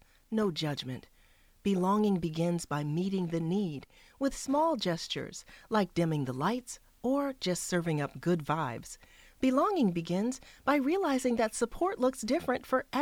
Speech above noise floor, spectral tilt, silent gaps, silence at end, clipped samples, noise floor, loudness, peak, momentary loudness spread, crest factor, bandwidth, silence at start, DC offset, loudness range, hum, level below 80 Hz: 32 dB; -5.5 dB/octave; none; 0 s; under 0.1%; -62 dBFS; -31 LUFS; -14 dBFS; 9 LU; 18 dB; 17 kHz; 0.3 s; under 0.1%; 2 LU; none; -58 dBFS